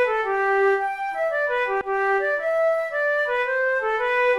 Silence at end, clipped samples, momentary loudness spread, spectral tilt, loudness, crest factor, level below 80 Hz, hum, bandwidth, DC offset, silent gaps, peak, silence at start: 0 s; under 0.1%; 4 LU; -3.5 dB/octave; -22 LUFS; 10 dB; -58 dBFS; none; 12 kHz; under 0.1%; none; -12 dBFS; 0 s